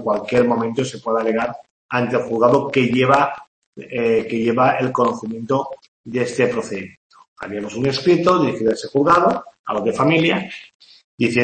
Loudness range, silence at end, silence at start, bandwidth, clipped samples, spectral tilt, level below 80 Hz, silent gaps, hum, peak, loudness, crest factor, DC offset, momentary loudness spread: 4 LU; 0 s; 0 s; 8.8 kHz; under 0.1%; -6 dB/octave; -56 dBFS; 1.71-1.89 s, 3.47-3.73 s, 5.88-6.04 s, 6.97-7.10 s, 7.28-7.36 s, 9.59-9.64 s, 10.75-10.80 s, 11.04-11.18 s; none; -2 dBFS; -18 LUFS; 18 dB; under 0.1%; 14 LU